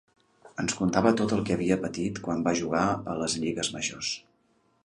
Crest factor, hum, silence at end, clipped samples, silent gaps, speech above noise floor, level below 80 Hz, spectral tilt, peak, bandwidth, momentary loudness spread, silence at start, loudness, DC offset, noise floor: 22 dB; none; 0.65 s; under 0.1%; none; 41 dB; -56 dBFS; -4.5 dB/octave; -6 dBFS; 11 kHz; 9 LU; 0.45 s; -28 LUFS; under 0.1%; -68 dBFS